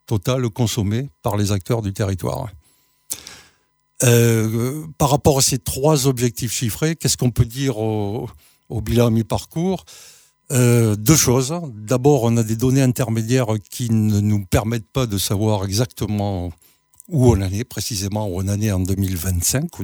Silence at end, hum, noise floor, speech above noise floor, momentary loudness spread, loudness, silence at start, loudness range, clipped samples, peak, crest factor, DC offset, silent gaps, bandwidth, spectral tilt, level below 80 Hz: 0 s; none; -62 dBFS; 44 dB; 10 LU; -19 LUFS; 0.1 s; 4 LU; under 0.1%; 0 dBFS; 18 dB; under 0.1%; none; over 20 kHz; -5 dB/octave; -40 dBFS